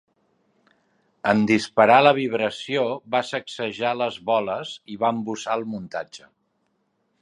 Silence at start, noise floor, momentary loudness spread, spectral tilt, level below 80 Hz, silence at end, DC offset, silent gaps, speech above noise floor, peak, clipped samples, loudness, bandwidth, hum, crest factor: 1.25 s; -71 dBFS; 15 LU; -5 dB/octave; -66 dBFS; 1.05 s; under 0.1%; none; 49 dB; -2 dBFS; under 0.1%; -22 LUFS; 11 kHz; none; 22 dB